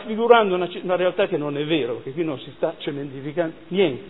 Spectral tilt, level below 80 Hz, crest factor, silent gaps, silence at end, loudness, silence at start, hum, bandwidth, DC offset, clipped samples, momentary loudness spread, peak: -9.5 dB/octave; -64 dBFS; 22 dB; none; 0 s; -22 LUFS; 0 s; none; 4.1 kHz; 0.4%; under 0.1%; 12 LU; 0 dBFS